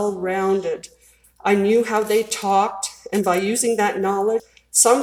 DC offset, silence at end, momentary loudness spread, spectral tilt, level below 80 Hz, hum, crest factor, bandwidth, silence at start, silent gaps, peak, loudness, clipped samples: under 0.1%; 0 s; 9 LU; -3 dB/octave; -62 dBFS; none; 20 dB; 19 kHz; 0 s; none; 0 dBFS; -20 LUFS; under 0.1%